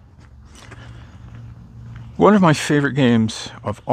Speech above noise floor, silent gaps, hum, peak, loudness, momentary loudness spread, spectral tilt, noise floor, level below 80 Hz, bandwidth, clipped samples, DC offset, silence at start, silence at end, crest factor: 28 dB; none; none; 0 dBFS; -17 LUFS; 26 LU; -6 dB/octave; -44 dBFS; -46 dBFS; 15 kHz; under 0.1%; under 0.1%; 0.7 s; 0 s; 18 dB